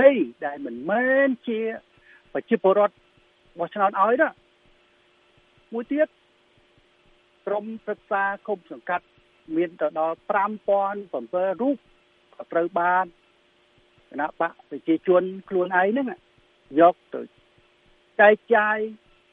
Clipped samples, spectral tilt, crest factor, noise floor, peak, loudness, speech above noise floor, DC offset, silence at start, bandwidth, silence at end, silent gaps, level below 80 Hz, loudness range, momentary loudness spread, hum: under 0.1%; -8.5 dB/octave; 22 dB; -61 dBFS; -2 dBFS; -24 LUFS; 38 dB; under 0.1%; 0 s; 4 kHz; 0.4 s; none; -70 dBFS; 8 LU; 15 LU; none